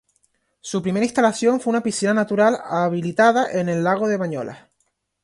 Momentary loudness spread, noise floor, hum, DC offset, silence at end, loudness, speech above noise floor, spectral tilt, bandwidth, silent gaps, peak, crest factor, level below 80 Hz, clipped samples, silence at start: 10 LU; -70 dBFS; none; under 0.1%; 0.65 s; -20 LUFS; 51 dB; -5.5 dB/octave; 11.5 kHz; none; -2 dBFS; 18 dB; -64 dBFS; under 0.1%; 0.65 s